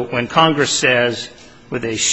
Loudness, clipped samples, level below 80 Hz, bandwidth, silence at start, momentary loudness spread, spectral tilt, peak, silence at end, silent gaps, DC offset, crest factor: -15 LUFS; under 0.1%; -52 dBFS; 10 kHz; 0 s; 14 LU; -2.5 dB/octave; 0 dBFS; 0 s; none; 0.3%; 16 dB